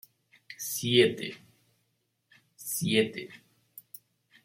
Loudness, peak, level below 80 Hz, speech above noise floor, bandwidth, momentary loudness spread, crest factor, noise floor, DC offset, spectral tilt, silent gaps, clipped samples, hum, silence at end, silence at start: -28 LUFS; -8 dBFS; -74 dBFS; 50 dB; 16.5 kHz; 26 LU; 24 dB; -77 dBFS; under 0.1%; -4 dB/octave; none; under 0.1%; none; 0.65 s; 0.5 s